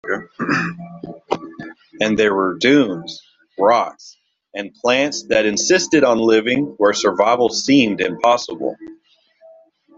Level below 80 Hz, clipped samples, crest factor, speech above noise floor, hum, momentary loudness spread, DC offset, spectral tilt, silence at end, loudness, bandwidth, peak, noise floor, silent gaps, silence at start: -58 dBFS; under 0.1%; 16 dB; 38 dB; none; 19 LU; under 0.1%; -3.5 dB/octave; 1.05 s; -17 LUFS; 7.8 kHz; -2 dBFS; -54 dBFS; none; 0.05 s